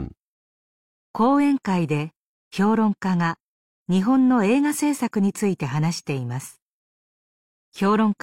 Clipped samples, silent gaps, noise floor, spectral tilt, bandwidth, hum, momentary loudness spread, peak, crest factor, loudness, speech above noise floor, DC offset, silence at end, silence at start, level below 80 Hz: under 0.1%; 0.19-1.14 s, 2.17-2.51 s, 3.40-3.86 s, 6.62-7.72 s; under -90 dBFS; -6.5 dB/octave; 16.5 kHz; none; 16 LU; -8 dBFS; 14 dB; -22 LUFS; over 69 dB; under 0.1%; 0.1 s; 0 s; -56 dBFS